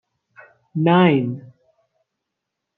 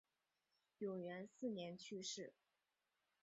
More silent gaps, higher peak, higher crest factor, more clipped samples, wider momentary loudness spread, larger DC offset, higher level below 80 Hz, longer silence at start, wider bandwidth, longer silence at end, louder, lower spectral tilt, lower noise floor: neither; first, -2 dBFS vs -36 dBFS; about the same, 20 dB vs 18 dB; neither; first, 17 LU vs 4 LU; neither; first, -68 dBFS vs under -90 dBFS; about the same, 0.75 s vs 0.8 s; second, 4.1 kHz vs 7.6 kHz; first, 1.35 s vs 0.9 s; first, -17 LUFS vs -50 LUFS; first, -10.5 dB/octave vs -4.5 dB/octave; second, -81 dBFS vs -90 dBFS